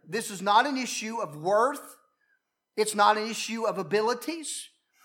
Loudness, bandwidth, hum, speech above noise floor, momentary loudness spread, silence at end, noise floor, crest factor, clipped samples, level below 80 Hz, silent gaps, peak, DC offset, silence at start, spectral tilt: -27 LUFS; 17.5 kHz; none; 47 dB; 12 LU; 0.35 s; -74 dBFS; 20 dB; under 0.1%; under -90 dBFS; none; -8 dBFS; under 0.1%; 0.05 s; -3 dB/octave